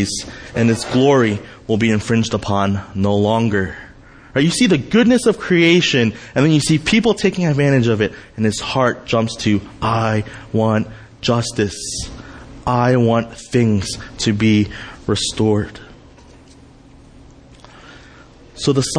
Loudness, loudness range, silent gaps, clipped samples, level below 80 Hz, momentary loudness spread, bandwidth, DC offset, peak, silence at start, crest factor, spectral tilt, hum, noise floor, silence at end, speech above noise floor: -17 LUFS; 6 LU; none; under 0.1%; -42 dBFS; 10 LU; 10.5 kHz; under 0.1%; -2 dBFS; 0 s; 16 dB; -5.5 dB/octave; none; -44 dBFS; 0 s; 27 dB